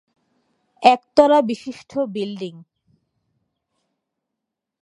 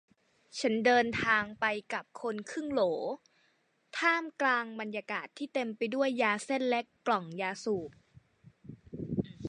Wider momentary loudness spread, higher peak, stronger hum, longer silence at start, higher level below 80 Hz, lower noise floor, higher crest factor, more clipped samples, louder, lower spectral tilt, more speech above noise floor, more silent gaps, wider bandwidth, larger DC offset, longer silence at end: first, 15 LU vs 11 LU; first, 0 dBFS vs -14 dBFS; neither; first, 0.8 s vs 0.55 s; about the same, -64 dBFS vs -66 dBFS; first, -82 dBFS vs -72 dBFS; about the same, 22 dB vs 20 dB; neither; first, -18 LUFS vs -32 LUFS; about the same, -5.5 dB/octave vs -4.5 dB/octave; first, 64 dB vs 41 dB; neither; about the same, 11 kHz vs 10.5 kHz; neither; first, 2.2 s vs 0 s